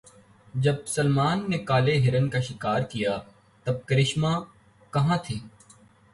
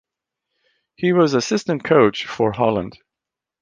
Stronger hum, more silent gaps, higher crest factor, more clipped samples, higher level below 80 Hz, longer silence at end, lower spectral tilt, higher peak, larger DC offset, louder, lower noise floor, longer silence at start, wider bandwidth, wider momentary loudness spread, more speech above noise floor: neither; neither; about the same, 16 dB vs 18 dB; neither; about the same, -54 dBFS vs -54 dBFS; about the same, 0.65 s vs 0.7 s; about the same, -6 dB/octave vs -5.5 dB/octave; second, -10 dBFS vs -2 dBFS; neither; second, -26 LUFS vs -18 LUFS; second, -55 dBFS vs -86 dBFS; second, 0.55 s vs 1 s; first, 11.5 kHz vs 9.6 kHz; about the same, 10 LU vs 8 LU; second, 31 dB vs 68 dB